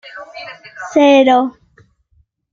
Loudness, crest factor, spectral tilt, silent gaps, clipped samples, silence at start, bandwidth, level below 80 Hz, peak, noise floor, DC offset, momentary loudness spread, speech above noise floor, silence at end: -12 LUFS; 14 dB; -3.5 dB/octave; none; under 0.1%; 0.15 s; 7.4 kHz; -60 dBFS; 0 dBFS; -58 dBFS; under 0.1%; 23 LU; 45 dB; 1 s